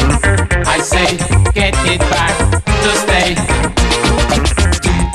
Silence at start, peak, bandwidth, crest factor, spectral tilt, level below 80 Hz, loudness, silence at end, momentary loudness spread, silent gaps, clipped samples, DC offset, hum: 0 s; 0 dBFS; 13 kHz; 12 dB; -4 dB/octave; -18 dBFS; -12 LUFS; 0 s; 2 LU; none; under 0.1%; under 0.1%; none